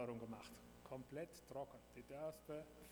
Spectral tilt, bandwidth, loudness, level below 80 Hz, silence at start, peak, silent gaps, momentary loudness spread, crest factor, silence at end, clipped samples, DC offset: -6 dB/octave; over 20 kHz; -54 LUFS; -72 dBFS; 0 s; -36 dBFS; none; 8 LU; 16 dB; 0 s; under 0.1%; under 0.1%